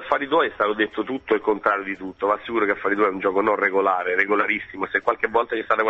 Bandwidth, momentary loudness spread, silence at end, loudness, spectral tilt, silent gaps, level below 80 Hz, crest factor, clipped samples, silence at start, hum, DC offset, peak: 7.2 kHz; 5 LU; 0 s; -22 LUFS; -6.5 dB/octave; none; -60 dBFS; 18 dB; under 0.1%; 0 s; none; under 0.1%; -4 dBFS